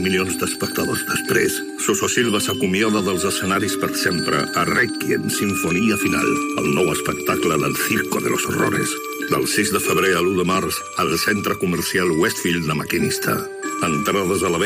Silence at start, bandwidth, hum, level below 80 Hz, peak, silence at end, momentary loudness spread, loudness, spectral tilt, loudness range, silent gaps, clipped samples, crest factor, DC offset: 0 s; 15.5 kHz; none; -52 dBFS; -4 dBFS; 0 s; 4 LU; -19 LUFS; -3.5 dB/octave; 1 LU; none; under 0.1%; 16 dB; under 0.1%